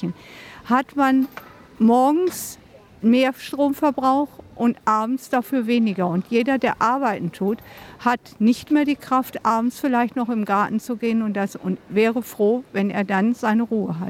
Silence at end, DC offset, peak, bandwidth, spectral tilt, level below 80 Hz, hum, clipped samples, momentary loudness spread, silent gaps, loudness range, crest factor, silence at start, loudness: 0 s; under 0.1%; -6 dBFS; 16.5 kHz; -6 dB/octave; -60 dBFS; none; under 0.1%; 7 LU; none; 1 LU; 14 dB; 0 s; -21 LUFS